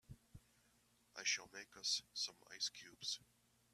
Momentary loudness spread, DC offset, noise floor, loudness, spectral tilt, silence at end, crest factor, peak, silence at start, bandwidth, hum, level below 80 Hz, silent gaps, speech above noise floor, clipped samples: 16 LU; under 0.1%; -76 dBFS; -44 LUFS; 1 dB/octave; 0.55 s; 22 dB; -26 dBFS; 0.1 s; 15 kHz; 60 Hz at -80 dBFS; -78 dBFS; none; 29 dB; under 0.1%